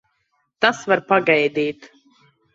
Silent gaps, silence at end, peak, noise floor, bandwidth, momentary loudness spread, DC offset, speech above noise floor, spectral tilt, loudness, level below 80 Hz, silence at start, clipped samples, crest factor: none; 0.7 s; -2 dBFS; -69 dBFS; 8 kHz; 9 LU; under 0.1%; 51 dB; -4.5 dB/octave; -19 LUFS; -68 dBFS; 0.6 s; under 0.1%; 20 dB